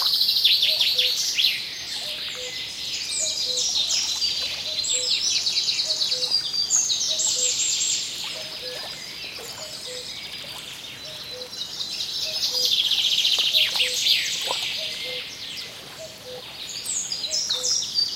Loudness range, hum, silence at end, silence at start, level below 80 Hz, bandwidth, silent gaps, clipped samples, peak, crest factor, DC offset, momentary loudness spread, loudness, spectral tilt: 10 LU; none; 0 s; 0 s; -62 dBFS; 17 kHz; none; under 0.1%; -6 dBFS; 20 dB; under 0.1%; 15 LU; -21 LUFS; 1.5 dB/octave